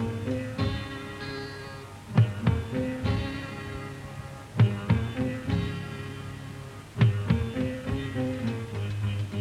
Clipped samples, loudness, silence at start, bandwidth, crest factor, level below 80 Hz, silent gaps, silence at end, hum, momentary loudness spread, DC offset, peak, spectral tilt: under 0.1%; -30 LUFS; 0 s; 12.5 kHz; 18 dB; -46 dBFS; none; 0 s; none; 15 LU; under 0.1%; -10 dBFS; -7.5 dB/octave